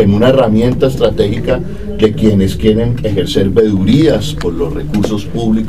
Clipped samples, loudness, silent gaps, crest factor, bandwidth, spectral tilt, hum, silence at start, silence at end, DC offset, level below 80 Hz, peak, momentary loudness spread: 0.2%; -12 LUFS; none; 12 dB; 14.5 kHz; -7 dB/octave; none; 0 s; 0 s; 5%; -26 dBFS; 0 dBFS; 7 LU